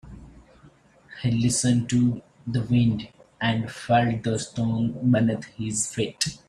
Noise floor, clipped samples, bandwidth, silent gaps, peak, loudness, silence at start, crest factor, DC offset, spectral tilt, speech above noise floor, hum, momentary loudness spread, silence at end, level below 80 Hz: -54 dBFS; under 0.1%; 12.5 kHz; none; -6 dBFS; -24 LUFS; 0.05 s; 18 dB; under 0.1%; -5 dB/octave; 31 dB; none; 9 LU; 0.1 s; -52 dBFS